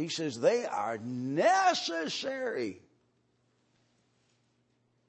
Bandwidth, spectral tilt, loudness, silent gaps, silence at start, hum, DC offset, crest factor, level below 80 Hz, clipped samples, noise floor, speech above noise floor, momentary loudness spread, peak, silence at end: 8.8 kHz; -3.5 dB/octave; -30 LUFS; none; 0 s; none; under 0.1%; 20 dB; -86 dBFS; under 0.1%; -73 dBFS; 43 dB; 10 LU; -14 dBFS; 2.3 s